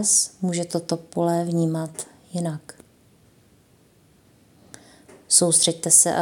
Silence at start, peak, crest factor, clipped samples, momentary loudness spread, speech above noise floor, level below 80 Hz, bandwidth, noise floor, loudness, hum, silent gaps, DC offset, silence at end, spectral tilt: 0 s; -2 dBFS; 22 dB; under 0.1%; 17 LU; 36 dB; -70 dBFS; 17 kHz; -57 dBFS; -20 LUFS; none; none; under 0.1%; 0 s; -3 dB/octave